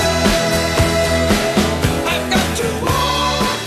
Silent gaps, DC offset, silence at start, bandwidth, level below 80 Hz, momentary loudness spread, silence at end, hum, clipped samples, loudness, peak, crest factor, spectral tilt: none; under 0.1%; 0 s; 13.5 kHz; -28 dBFS; 3 LU; 0 s; none; under 0.1%; -16 LUFS; 0 dBFS; 16 dB; -4 dB/octave